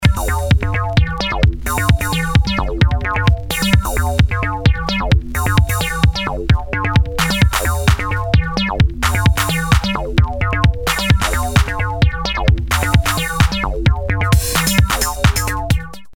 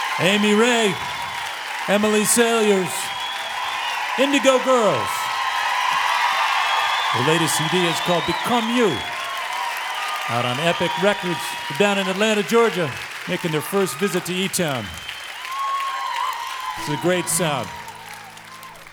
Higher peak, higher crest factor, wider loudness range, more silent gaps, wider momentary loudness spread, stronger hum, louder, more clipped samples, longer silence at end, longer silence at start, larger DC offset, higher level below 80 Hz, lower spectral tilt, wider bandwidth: about the same, 0 dBFS vs -2 dBFS; about the same, 14 dB vs 18 dB; second, 1 LU vs 5 LU; neither; second, 3 LU vs 11 LU; neither; first, -16 LUFS vs -20 LUFS; neither; about the same, 0 s vs 0 s; about the same, 0 s vs 0 s; neither; first, -20 dBFS vs -58 dBFS; first, -4.5 dB/octave vs -3 dB/octave; about the same, 18.5 kHz vs over 20 kHz